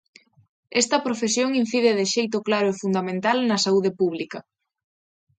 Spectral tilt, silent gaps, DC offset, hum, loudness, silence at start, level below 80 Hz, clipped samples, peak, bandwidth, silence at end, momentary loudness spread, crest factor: -3.5 dB/octave; none; under 0.1%; none; -22 LUFS; 0.7 s; -72 dBFS; under 0.1%; -6 dBFS; 9.6 kHz; 0.95 s; 5 LU; 18 dB